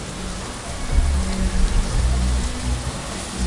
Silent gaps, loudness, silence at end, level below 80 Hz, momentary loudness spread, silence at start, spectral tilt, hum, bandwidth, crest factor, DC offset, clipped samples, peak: none; -24 LUFS; 0 s; -22 dBFS; 8 LU; 0 s; -4.5 dB/octave; none; 11.5 kHz; 16 dB; under 0.1%; under 0.1%; -6 dBFS